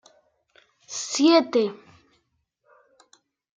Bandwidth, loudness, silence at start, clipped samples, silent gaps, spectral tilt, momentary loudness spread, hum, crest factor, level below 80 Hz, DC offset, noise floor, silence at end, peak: 9.4 kHz; -22 LUFS; 0.9 s; under 0.1%; none; -3 dB/octave; 15 LU; none; 20 dB; -80 dBFS; under 0.1%; -73 dBFS; 1.8 s; -6 dBFS